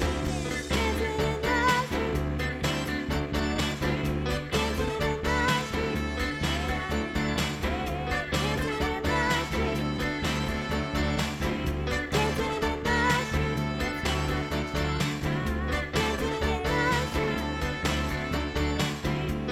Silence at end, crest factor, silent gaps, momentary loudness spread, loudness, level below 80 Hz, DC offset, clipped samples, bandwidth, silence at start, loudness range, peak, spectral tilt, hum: 0 s; 16 dB; none; 5 LU; -28 LUFS; -36 dBFS; under 0.1%; under 0.1%; 16 kHz; 0 s; 1 LU; -12 dBFS; -5 dB/octave; none